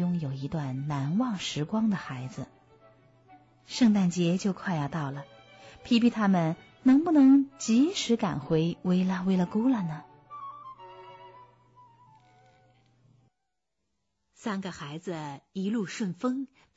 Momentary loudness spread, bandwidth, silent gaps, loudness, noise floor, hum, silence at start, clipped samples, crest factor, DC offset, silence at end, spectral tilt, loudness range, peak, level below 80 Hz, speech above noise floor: 19 LU; 8 kHz; none; -27 LUFS; -84 dBFS; none; 0 s; under 0.1%; 16 dB; under 0.1%; 0.3 s; -6 dB/octave; 16 LU; -12 dBFS; -64 dBFS; 57 dB